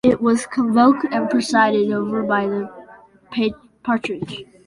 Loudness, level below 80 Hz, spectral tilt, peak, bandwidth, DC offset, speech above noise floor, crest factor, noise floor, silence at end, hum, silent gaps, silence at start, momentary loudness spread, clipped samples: -19 LUFS; -56 dBFS; -5.5 dB/octave; -2 dBFS; 11.5 kHz; under 0.1%; 27 dB; 16 dB; -46 dBFS; 0.25 s; none; none; 0.05 s; 14 LU; under 0.1%